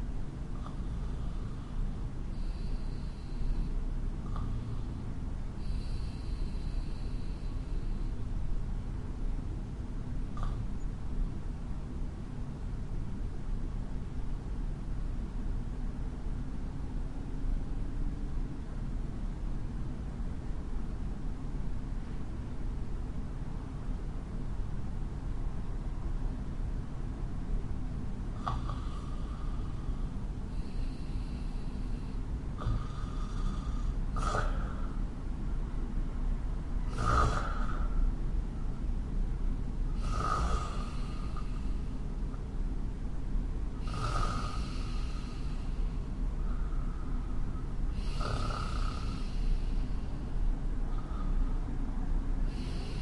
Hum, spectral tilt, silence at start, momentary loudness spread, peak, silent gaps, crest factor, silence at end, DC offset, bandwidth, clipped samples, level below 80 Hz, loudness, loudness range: none; -7 dB/octave; 0 s; 5 LU; -16 dBFS; none; 18 dB; 0 s; under 0.1%; 10.5 kHz; under 0.1%; -34 dBFS; -39 LUFS; 5 LU